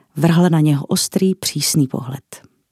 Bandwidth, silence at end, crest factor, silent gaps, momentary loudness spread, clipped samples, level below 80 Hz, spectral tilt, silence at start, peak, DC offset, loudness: 15.5 kHz; 0.35 s; 16 dB; none; 13 LU; under 0.1%; -60 dBFS; -5 dB/octave; 0.15 s; 0 dBFS; under 0.1%; -16 LUFS